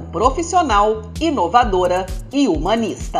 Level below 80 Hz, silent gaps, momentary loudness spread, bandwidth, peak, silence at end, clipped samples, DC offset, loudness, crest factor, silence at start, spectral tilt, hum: -30 dBFS; none; 6 LU; 14 kHz; 0 dBFS; 0 s; under 0.1%; under 0.1%; -17 LUFS; 16 dB; 0 s; -5 dB/octave; none